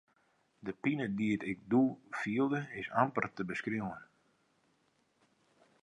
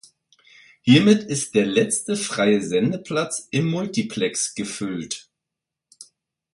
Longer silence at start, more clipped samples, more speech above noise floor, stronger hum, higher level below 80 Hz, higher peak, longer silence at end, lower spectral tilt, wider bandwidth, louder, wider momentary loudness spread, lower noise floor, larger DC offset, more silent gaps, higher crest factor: second, 0.65 s vs 0.85 s; neither; second, 40 dB vs 64 dB; neither; second, -72 dBFS vs -62 dBFS; second, -14 dBFS vs -2 dBFS; first, 1.8 s vs 0.5 s; first, -7.5 dB/octave vs -4.5 dB/octave; about the same, 10.5 kHz vs 11.5 kHz; second, -35 LUFS vs -21 LUFS; about the same, 11 LU vs 12 LU; second, -75 dBFS vs -85 dBFS; neither; neither; about the same, 22 dB vs 20 dB